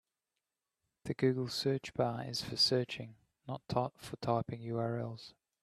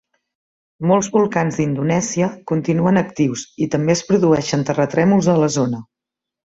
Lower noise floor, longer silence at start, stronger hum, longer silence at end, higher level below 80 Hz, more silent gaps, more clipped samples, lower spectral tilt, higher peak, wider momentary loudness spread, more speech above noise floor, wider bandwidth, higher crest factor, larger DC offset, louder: first, -90 dBFS vs -85 dBFS; first, 1.05 s vs 0.8 s; neither; second, 0.3 s vs 0.75 s; second, -68 dBFS vs -54 dBFS; neither; neither; about the same, -5.5 dB/octave vs -6 dB/octave; second, -16 dBFS vs -2 dBFS; first, 18 LU vs 7 LU; second, 54 dB vs 68 dB; first, 14 kHz vs 8 kHz; about the same, 20 dB vs 16 dB; neither; second, -35 LUFS vs -18 LUFS